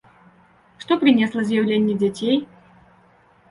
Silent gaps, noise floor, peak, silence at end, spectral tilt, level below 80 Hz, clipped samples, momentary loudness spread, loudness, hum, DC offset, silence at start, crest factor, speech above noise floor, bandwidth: none; -55 dBFS; -4 dBFS; 1.05 s; -6.5 dB/octave; -62 dBFS; under 0.1%; 7 LU; -20 LUFS; none; under 0.1%; 0.8 s; 18 dB; 36 dB; 11 kHz